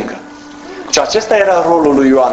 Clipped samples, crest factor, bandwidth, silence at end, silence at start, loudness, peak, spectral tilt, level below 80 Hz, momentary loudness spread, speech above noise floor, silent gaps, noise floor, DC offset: under 0.1%; 12 dB; 8.2 kHz; 0 s; 0 s; -11 LUFS; 0 dBFS; -3.5 dB/octave; -46 dBFS; 20 LU; 22 dB; none; -32 dBFS; under 0.1%